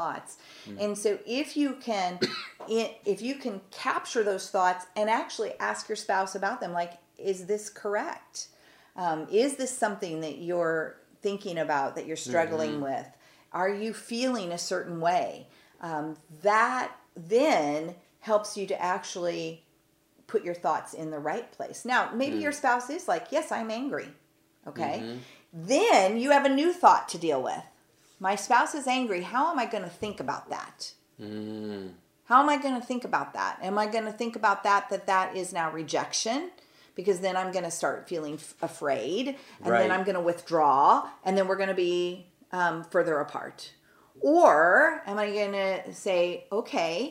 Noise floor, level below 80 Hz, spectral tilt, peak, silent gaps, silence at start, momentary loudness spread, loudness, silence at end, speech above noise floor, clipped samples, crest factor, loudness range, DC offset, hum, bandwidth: -66 dBFS; -78 dBFS; -3.5 dB/octave; -6 dBFS; none; 0 s; 15 LU; -28 LUFS; 0 s; 39 dB; under 0.1%; 24 dB; 7 LU; under 0.1%; none; 16 kHz